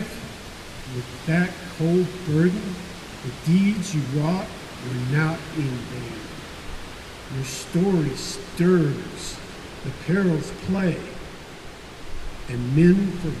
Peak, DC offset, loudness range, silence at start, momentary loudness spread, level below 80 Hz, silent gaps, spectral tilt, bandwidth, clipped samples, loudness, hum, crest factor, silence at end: -6 dBFS; under 0.1%; 4 LU; 0 s; 18 LU; -42 dBFS; none; -6.5 dB/octave; 13.5 kHz; under 0.1%; -24 LUFS; none; 18 dB; 0 s